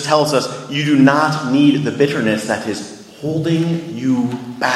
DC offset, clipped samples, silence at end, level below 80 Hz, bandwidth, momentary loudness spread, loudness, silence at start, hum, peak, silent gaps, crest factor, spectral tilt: under 0.1%; under 0.1%; 0 s; -58 dBFS; 13.5 kHz; 11 LU; -16 LUFS; 0 s; none; 0 dBFS; none; 16 dB; -5.5 dB/octave